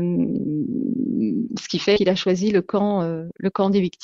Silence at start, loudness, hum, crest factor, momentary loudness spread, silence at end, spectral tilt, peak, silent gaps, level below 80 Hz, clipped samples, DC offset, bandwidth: 0 s; -22 LUFS; none; 16 dB; 7 LU; 0.15 s; -6.5 dB/octave; -4 dBFS; none; -56 dBFS; under 0.1%; under 0.1%; 7.6 kHz